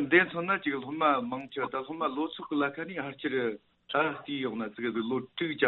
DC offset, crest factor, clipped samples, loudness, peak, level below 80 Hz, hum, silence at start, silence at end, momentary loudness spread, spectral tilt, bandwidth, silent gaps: under 0.1%; 20 dB; under 0.1%; -31 LUFS; -10 dBFS; -74 dBFS; none; 0 s; 0 s; 8 LU; -3 dB/octave; 4.2 kHz; none